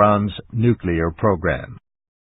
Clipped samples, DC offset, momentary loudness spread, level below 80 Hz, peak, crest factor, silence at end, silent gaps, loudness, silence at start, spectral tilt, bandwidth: under 0.1%; under 0.1%; 8 LU; -36 dBFS; -2 dBFS; 18 dB; 0.55 s; none; -20 LUFS; 0 s; -12.5 dB/octave; 4 kHz